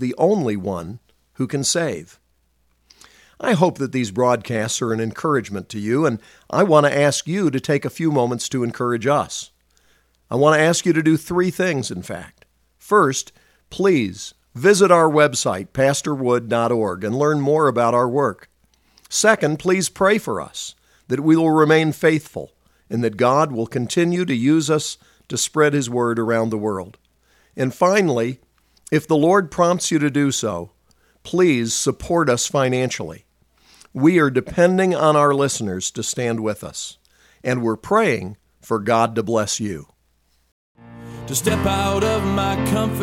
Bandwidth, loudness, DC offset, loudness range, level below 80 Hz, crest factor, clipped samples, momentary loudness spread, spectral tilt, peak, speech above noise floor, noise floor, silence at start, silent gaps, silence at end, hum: 16.5 kHz; -19 LUFS; under 0.1%; 5 LU; -50 dBFS; 20 dB; under 0.1%; 13 LU; -5 dB/octave; 0 dBFS; 45 dB; -63 dBFS; 0 s; 40.52-40.75 s; 0 s; none